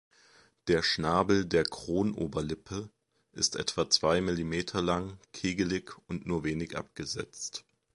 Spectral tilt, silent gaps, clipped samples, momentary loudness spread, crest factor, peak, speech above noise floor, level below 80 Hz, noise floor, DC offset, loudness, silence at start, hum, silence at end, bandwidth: -4 dB/octave; none; under 0.1%; 14 LU; 22 dB; -10 dBFS; 31 dB; -52 dBFS; -62 dBFS; under 0.1%; -31 LUFS; 0.65 s; none; 0.35 s; 11.5 kHz